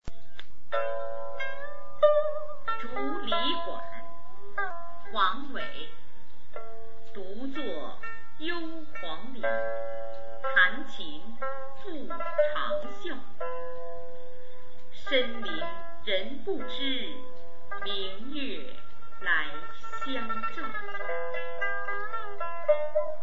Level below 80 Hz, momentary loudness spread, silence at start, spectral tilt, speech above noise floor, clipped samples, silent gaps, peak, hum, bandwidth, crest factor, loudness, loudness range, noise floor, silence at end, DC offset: -60 dBFS; 18 LU; 0 s; -1.5 dB/octave; 23 dB; under 0.1%; none; -8 dBFS; none; 7.6 kHz; 24 dB; -32 LUFS; 6 LU; -56 dBFS; 0 s; 7%